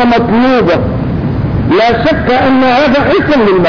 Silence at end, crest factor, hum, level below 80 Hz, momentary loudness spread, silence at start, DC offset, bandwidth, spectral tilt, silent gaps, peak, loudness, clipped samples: 0 s; 6 dB; none; -26 dBFS; 6 LU; 0 s; under 0.1%; 5.4 kHz; -7.5 dB/octave; none; -2 dBFS; -9 LUFS; under 0.1%